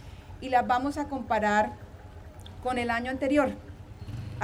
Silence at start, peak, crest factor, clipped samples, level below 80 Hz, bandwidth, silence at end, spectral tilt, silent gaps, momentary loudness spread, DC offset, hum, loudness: 0 s; -12 dBFS; 18 dB; under 0.1%; -50 dBFS; 14 kHz; 0 s; -6 dB/octave; none; 21 LU; under 0.1%; none; -28 LUFS